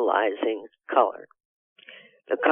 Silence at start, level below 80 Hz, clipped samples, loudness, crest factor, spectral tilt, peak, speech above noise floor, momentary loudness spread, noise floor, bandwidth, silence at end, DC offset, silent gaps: 0 s; under -90 dBFS; under 0.1%; -26 LUFS; 22 dB; -6 dB/octave; -4 dBFS; 25 dB; 24 LU; -50 dBFS; 3.7 kHz; 0 s; under 0.1%; 1.45-1.76 s